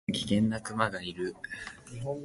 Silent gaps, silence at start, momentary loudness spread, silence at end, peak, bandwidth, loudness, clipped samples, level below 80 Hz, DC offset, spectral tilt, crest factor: none; 0.1 s; 13 LU; 0 s; -10 dBFS; 11.5 kHz; -32 LUFS; under 0.1%; -58 dBFS; under 0.1%; -5 dB/octave; 22 dB